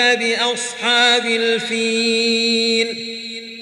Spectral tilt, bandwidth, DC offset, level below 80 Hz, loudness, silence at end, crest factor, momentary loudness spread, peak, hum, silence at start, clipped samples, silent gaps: -1.5 dB/octave; 12 kHz; under 0.1%; -72 dBFS; -16 LUFS; 0 s; 16 dB; 12 LU; -2 dBFS; none; 0 s; under 0.1%; none